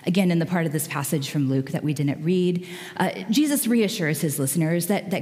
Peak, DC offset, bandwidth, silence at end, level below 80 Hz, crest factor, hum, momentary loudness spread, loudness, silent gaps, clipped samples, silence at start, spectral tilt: -6 dBFS; under 0.1%; 16 kHz; 0 s; -72 dBFS; 16 dB; none; 5 LU; -23 LUFS; none; under 0.1%; 0 s; -5.5 dB/octave